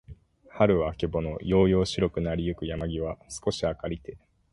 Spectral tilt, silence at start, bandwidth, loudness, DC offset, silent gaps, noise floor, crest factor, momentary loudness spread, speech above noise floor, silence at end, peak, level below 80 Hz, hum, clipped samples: -6.5 dB/octave; 0.1 s; 11.5 kHz; -27 LUFS; under 0.1%; none; -50 dBFS; 20 dB; 11 LU; 23 dB; 0.35 s; -8 dBFS; -42 dBFS; none; under 0.1%